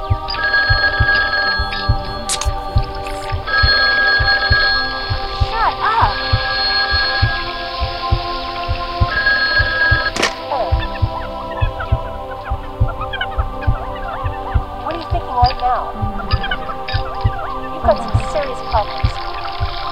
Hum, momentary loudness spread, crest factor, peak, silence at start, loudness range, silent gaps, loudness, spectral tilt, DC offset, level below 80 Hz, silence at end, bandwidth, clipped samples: none; 11 LU; 18 dB; 0 dBFS; 0 s; 7 LU; none; -17 LUFS; -4 dB/octave; under 0.1%; -24 dBFS; 0 s; 15 kHz; under 0.1%